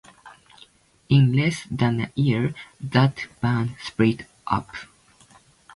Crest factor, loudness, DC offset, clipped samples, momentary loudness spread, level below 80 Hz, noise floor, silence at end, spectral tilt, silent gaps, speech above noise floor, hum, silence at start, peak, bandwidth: 20 dB; -23 LUFS; under 0.1%; under 0.1%; 11 LU; -52 dBFS; -54 dBFS; 0.9 s; -7 dB/octave; none; 33 dB; none; 0.25 s; -4 dBFS; 11.5 kHz